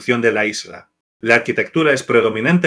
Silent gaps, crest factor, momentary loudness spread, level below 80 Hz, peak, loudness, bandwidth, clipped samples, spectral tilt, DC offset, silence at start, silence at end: 1.00-1.20 s; 16 dB; 11 LU; -64 dBFS; 0 dBFS; -16 LUFS; 11 kHz; under 0.1%; -5 dB/octave; under 0.1%; 0 s; 0 s